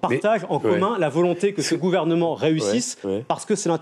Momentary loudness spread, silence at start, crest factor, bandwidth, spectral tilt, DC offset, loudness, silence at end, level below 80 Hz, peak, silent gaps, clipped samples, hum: 5 LU; 0.05 s; 14 dB; 13.5 kHz; -5 dB/octave; under 0.1%; -22 LUFS; 0 s; -68 dBFS; -8 dBFS; none; under 0.1%; none